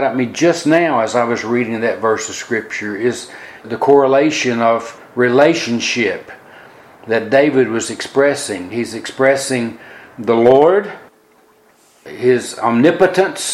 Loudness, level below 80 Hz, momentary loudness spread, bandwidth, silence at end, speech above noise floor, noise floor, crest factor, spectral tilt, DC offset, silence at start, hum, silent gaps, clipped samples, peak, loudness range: -15 LUFS; -60 dBFS; 13 LU; 12.5 kHz; 0 s; 36 dB; -51 dBFS; 16 dB; -4.5 dB/octave; under 0.1%; 0 s; none; none; under 0.1%; 0 dBFS; 2 LU